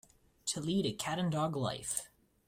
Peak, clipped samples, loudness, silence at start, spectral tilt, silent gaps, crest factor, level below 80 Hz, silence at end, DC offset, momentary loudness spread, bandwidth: -14 dBFS; under 0.1%; -36 LUFS; 0.45 s; -4.5 dB/octave; none; 22 dB; -66 dBFS; 0.4 s; under 0.1%; 6 LU; 16 kHz